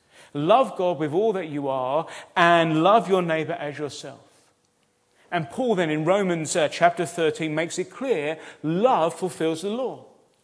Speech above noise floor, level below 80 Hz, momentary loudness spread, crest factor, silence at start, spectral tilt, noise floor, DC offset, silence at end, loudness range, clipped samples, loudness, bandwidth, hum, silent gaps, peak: 44 dB; -74 dBFS; 12 LU; 20 dB; 0.35 s; -5 dB/octave; -67 dBFS; under 0.1%; 0.45 s; 5 LU; under 0.1%; -23 LUFS; 11 kHz; none; none; -2 dBFS